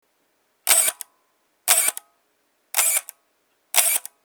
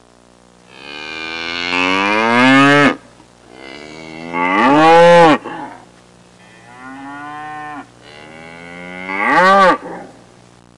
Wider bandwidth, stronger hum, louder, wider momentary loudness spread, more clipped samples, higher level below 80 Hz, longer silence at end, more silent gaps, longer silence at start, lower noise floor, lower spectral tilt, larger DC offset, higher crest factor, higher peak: first, over 20 kHz vs 11.5 kHz; second, none vs 60 Hz at -45 dBFS; second, -19 LUFS vs -11 LUFS; second, 17 LU vs 25 LU; neither; second, -86 dBFS vs -54 dBFS; second, 0.25 s vs 0.7 s; neither; second, 0.65 s vs 0.8 s; first, -68 dBFS vs -47 dBFS; second, 4.5 dB/octave vs -5 dB/octave; neither; first, 24 dB vs 14 dB; about the same, 0 dBFS vs -2 dBFS